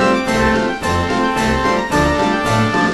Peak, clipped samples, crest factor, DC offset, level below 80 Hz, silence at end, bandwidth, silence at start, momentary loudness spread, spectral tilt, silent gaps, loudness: -2 dBFS; under 0.1%; 14 dB; under 0.1%; -30 dBFS; 0 s; 13 kHz; 0 s; 2 LU; -5 dB/octave; none; -16 LUFS